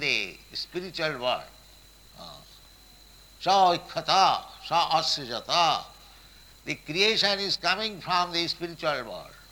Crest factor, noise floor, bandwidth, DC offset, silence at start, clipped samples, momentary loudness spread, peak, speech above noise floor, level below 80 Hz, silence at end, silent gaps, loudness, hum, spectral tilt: 20 dB; -53 dBFS; 19.5 kHz; under 0.1%; 0 s; under 0.1%; 16 LU; -8 dBFS; 27 dB; -58 dBFS; 0.1 s; none; -26 LUFS; none; -2.5 dB/octave